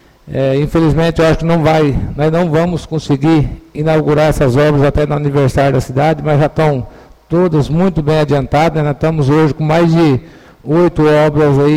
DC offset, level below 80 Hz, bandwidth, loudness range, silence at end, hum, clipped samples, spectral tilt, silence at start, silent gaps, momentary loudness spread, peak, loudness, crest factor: 0.5%; -30 dBFS; 13 kHz; 1 LU; 0 s; none; under 0.1%; -7.5 dB/octave; 0.25 s; none; 6 LU; -2 dBFS; -12 LUFS; 10 dB